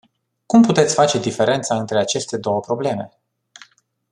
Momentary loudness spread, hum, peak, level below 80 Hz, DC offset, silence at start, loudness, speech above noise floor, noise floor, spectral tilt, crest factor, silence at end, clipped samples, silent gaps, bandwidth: 9 LU; none; -2 dBFS; -62 dBFS; under 0.1%; 0.5 s; -18 LUFS; 33 dB; -50 dBFS; -4.5 dB/octave; 18 dB; 1.05 s; under 0.1%; none; 11 kHz